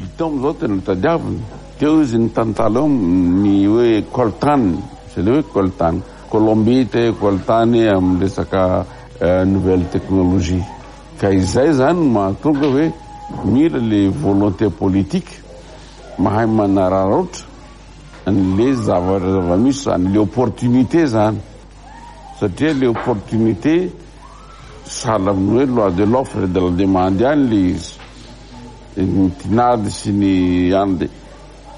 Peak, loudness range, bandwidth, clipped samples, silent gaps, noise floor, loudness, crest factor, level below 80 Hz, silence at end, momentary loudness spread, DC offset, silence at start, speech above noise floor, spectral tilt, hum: -2 dBFS; 3 LU; 11 kHz; under 0.1%; none; -38 dBFS; -16 LUFS; 14 dB; -38 dBFS; 0 s; 11 LU; under 0.1%; 0 s; 23 dB; -7.5 dB/octave; none